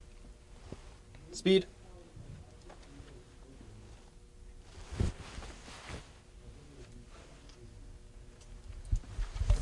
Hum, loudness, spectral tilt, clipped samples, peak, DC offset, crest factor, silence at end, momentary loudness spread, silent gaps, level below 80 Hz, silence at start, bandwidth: none; -36 LUFS; -6 dB/octave; under 0.1%; -14 dBFS; under 0.1%; 24 dB; 0 s; 21 LU; none; -42 dBFS; 0 s; 11.5 kHz